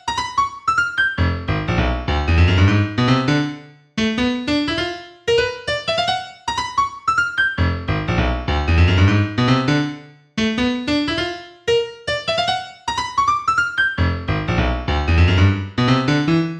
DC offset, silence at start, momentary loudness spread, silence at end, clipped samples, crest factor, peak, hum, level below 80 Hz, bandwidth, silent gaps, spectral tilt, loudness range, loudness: under 0.1%; 0.05 s; 8 LU; 0 s; under 0.1%; 16 dB; -4 dBFS; none; -30 dBFS; 9.4 kHz; none; -6 dB/octave; 3 LU; -19 LUFS